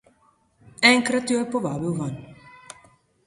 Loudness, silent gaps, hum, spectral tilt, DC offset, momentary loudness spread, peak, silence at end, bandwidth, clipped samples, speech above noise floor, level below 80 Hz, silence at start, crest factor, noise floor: -21 LUFS; none; none; -4 dB/octave; under 0.1%; 23 LU; -2 dBFS; 0.8 s; 11.5 kHz; under 0.1%; 40 dB; -60 dBFS; 0.8 s; 24 dB; -62 dBFS